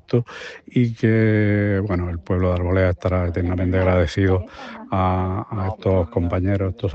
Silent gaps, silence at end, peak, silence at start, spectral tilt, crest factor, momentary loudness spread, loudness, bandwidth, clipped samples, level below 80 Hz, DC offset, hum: none; 0 s; -4 dBFS; 0.1 s; -8.5 dB/octave; 16 dB; 7 LU; -21 LUFS; 7.4 kHz; under 0.1%; -44 dBFS; under 0.1%; none